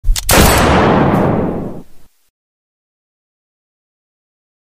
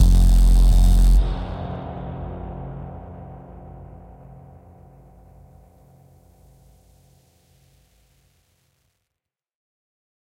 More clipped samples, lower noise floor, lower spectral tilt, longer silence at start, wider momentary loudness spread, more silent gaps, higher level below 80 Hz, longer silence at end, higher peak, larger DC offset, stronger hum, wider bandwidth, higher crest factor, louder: neither; second, -35 dBFS vs -85 dBFS; second, -4.5 dB/octave vs -6.5 dB/octave; about the same, 0.05 s vs 0 s; second, 13 LU vs 27 LU; neither; about the same, -22 dBFS vs -22 dBFS; second, 2.6 s vs 6.9 s; first, 0 dBFS vs -4 dBFS; neither; neither; first, 16 kHz vs 10.5 kHz; about the same, 16 dB vs 16 dB; first, -11 LUFS vs -21 LUFS